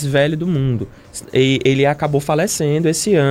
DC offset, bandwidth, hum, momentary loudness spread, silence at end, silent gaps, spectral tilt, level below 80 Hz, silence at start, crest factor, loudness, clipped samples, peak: under 0.1%; 16 kHz; none; 7 LU; 0 s; none; -5 dB/octave; -46 dBFS; 0 s; 14 dB; -17 LUFS; under 0.1%; -2 dBFS